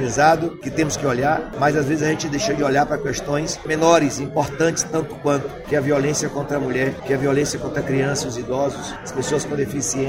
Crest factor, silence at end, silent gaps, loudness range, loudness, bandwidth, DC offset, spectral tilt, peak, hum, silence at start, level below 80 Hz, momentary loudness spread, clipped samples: 20 dB; 0 s; none; 3 LU; -21 LUFS; 16 kHz; under 0.1%; -4.5 dB/octave; -2 dBFS; none; 0 s; -44 dBFS; 7 LU; under 0.1%